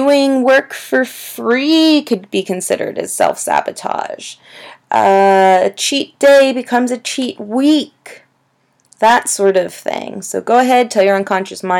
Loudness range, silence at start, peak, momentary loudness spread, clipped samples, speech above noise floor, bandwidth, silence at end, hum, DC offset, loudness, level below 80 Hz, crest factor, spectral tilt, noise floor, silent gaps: 4 LU; 0 s; 0 dBFS; 12 LU; under 0.1%; 46 dB; 18 kHz; 0 s; none; under 0.1%; -13 LUFS; -68 dBFS; 14 dB; -3.5 dB/octave; -60 dBFS; none